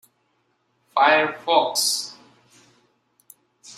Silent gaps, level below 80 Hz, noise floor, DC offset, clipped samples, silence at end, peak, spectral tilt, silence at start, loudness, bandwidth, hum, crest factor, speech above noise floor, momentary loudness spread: none; -78 dBFS; -69 dBFS; under 0.1%; under 0.1%; 0.05 s; -2 dBFS; -0.5 dB/octave; 0.95 s; -20 LUFS; 16 kHz; none; 22 dB; 49 dB; 10 LU